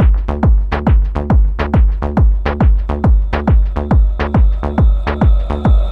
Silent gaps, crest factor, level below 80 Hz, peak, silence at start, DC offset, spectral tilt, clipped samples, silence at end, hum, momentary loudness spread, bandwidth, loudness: none; 10 dB; -12 dBFS; -2 dBFS; 0 s; under 0.1%; -9.5 dB/octave; under 0.1%; 0 s; none; 1 LU; 4.7 kHz; -14 LUFS